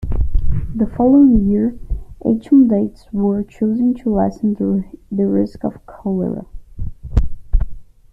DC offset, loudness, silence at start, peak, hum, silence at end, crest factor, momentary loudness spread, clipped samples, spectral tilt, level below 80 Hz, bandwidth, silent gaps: under 0.1%; -17 LUFS; 0 s; -2 dBFS; none; 0.3 s; 14 dB; 15 LU; under 0.1%; -11 dB/octave; -24 dBFS; 5.8 kHz; none